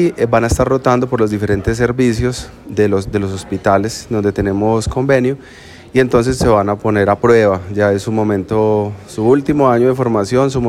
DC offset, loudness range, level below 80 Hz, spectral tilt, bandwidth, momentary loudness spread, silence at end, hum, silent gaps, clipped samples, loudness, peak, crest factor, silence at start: under 0.1%; 3 LU; -34 dBFS; -6.5 dB/octave; 15 kHz; 7 LU; 0 s; none; none; under 0.1%; -14 LUFS; 0 dBFS; 14 dB; 0 s